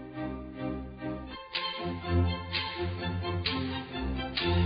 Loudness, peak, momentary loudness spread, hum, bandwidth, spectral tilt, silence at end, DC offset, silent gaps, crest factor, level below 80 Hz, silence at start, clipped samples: -33 LUFS; -14 dBFS; 9 LU; none; 5.4 kHz; -10 dB/octave; 0 s; under 0.1%; none; 18 dB; -40 dBFS; 0 s; under 0.1%